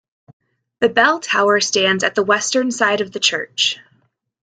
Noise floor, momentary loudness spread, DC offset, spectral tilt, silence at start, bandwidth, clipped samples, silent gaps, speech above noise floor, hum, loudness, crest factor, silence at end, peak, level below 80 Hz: -62 dBFS; 4 LU; under 0.1%; -2 dB/octave; 0.8 s; 9.6 kHz; under 0.1%; none; 45 dB; none; -16 LUFS; 18 dB; 0.65 s; -2 dBFS; -64 dBFS